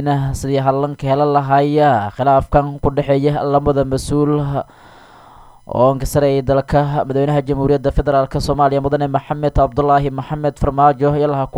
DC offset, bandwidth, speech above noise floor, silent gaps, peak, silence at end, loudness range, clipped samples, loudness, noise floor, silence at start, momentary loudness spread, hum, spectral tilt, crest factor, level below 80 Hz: under 0.1%; 13.5 kHz; 27 dB; none; 0 dBFS; 0 s; 3 LU; under 0.1%; -16 LUFS; -42 dBFS; 0 s; 5 LU; none; -7.5 dB/octave; 14 dB; -30 dBFS